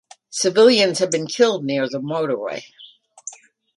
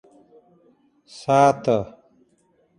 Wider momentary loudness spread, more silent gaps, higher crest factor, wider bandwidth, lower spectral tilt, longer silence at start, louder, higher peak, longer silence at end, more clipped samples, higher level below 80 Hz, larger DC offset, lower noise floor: first, 22 LU vs 17 LU; neither; about the same, 18 dB vs 20 dB; about the same, 11.5 kHz vs 10.5 kHz; second, -3.5 dB/octave vs -6 dB/octave; second, 0.3 s vs 1.15 s; about the same, -18 LUFS vs -20 LUFS; about the same, -2 dBFS vs -4 dBFS; second, 0.45 s vs 0.95 s; neither; second, -70 dBFS vs -60 dBFS; neither; second, -40 dBFS vs -63 dBFS